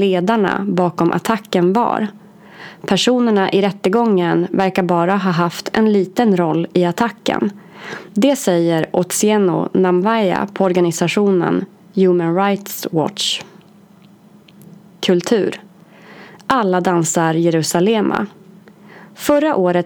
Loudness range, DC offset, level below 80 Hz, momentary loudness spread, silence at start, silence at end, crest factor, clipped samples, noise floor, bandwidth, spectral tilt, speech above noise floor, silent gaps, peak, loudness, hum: 5 LU; under 0.1%; -58 dBFS; 8 LU; 0 s; 0 s; 16 dB; under 0.1%; -46 dBFS; over 20 kHz; -5 dB/octave; 30 dB; none; 0 dBFS; -16 LUFS; none